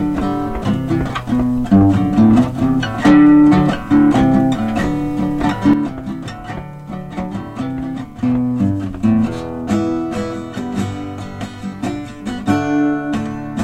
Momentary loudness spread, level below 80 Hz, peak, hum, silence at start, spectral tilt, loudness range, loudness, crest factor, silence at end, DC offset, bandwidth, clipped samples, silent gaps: 15 LU; -36 dBFS; -2 dBFS; none; 0 s; -7.5 dB/octave; 9 LU; -16 LUFS; 14 dB; 0 s; under 0.1%; 9.6 kHz; under 0.1%; none